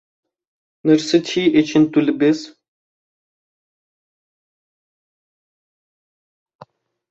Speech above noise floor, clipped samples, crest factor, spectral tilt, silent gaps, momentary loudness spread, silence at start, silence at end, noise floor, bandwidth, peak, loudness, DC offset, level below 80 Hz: 32 dB; under 0.1%; 20 dB; -5.5 dB/octave; none; 4 LU; 0.85 s; 4.6 s; -47 dBFS; 8 kHz; -2 dBFS; -17 LUFS; under 0.1%; -64 dBFS